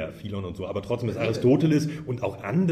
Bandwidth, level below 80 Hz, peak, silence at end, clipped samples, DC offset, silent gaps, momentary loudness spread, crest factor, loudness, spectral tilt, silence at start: 14 kHz; -54 dBFS; -10 dBFS; 0 s; under 0.1%; under 0.1%; none; 12 LU; 16 dB; -26 LUFS; -7.5 dB/octave; 0 s